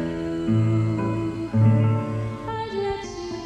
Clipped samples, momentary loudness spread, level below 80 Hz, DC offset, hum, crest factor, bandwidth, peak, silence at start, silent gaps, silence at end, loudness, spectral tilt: under 0.1%; 11 LU; -46 dBFS; under 0.1%; none; 14 dB; 8.2 kHz; -8 dBFS; 0 s; none; 0 s; -24 LUFS; -8.5 dB/octave